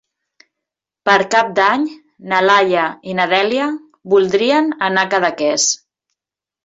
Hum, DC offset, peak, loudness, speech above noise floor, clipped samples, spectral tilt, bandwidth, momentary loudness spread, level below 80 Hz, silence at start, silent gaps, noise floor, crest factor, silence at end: none; under 0.1%; -2 dBFS; -15 LUFS; 71 dB; under 0.1%; -2.5 dB/octave; 8 kHz; 8 LU; -62 dBFS; 1.05 s; none; -86 dBFS; 14 dB; 0.9 s